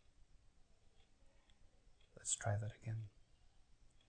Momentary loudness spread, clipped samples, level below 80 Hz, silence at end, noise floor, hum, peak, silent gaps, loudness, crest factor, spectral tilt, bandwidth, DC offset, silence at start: 10 LU; under 0.1%; -68 dBFS; 1 s; -68 dBFS; none; -26 dBFS; none; -44 LUFS; 24 dB; -3.5 dB/octave; 9 kHz; under 0.1%; 1 s